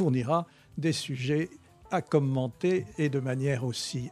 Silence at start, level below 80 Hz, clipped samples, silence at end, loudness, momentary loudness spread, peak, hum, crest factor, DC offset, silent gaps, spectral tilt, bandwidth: 0 s; -62 dBFS; under 0.1%; 0 s; -30 LUFS; 6 LU; -10 dBFS; none; 18 dB; under 0.1%; none; -6 dB/octave; 13.5 kHz